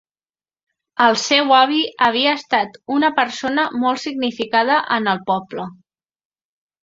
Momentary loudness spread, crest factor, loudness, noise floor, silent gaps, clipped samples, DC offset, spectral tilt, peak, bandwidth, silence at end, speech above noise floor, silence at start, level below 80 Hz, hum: 9 LU; 18 dB; -17 LUFS; under -90 dBFS; none; under 0.1%; under 0.1%; -3 dB/octave; 0 dBFS; 7.8 kHz; 1.1 s; over 72 dB; 1 s; -64 dBFS; none